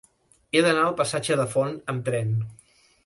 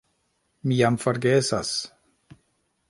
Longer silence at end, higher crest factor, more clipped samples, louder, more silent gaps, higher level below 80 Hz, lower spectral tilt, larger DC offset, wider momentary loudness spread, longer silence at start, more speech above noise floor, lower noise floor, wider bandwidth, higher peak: second, 0.5 s vs 1.05 s; about the same, 20 dB vs 20 dB; neither; about the same, -24 LUFS vs -23 LUFS; neither; about the same, -62 dBFS vs -60 dBFS; about the same, -5 dB/octave vs -5 dB/octave; neither; about the same, 9 LU vs 10 LU; about the same, 0.55 s vs 0.65 s; second, 38 dB vs 49 dB; second, -61 dBFS vs -71 dBFS; about the same, 11.5 kHz vs 11.5 kHz; about the same, -6 dBFS vs -6 dBFS